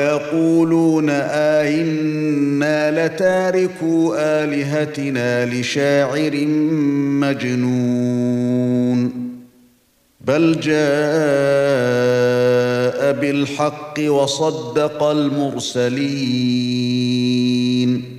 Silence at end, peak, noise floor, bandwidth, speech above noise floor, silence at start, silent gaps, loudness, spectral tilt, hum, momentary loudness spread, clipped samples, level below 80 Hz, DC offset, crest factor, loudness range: 0 s; -4 dBFS; -58 dBFS; 14.5 kHz; 41 dB; 0 s; none; -17 LUFS; -6 dB/octave; none; 4 LU; under 0.1%; -62 dBFS; under 0.1%; 14 dB; 2 LU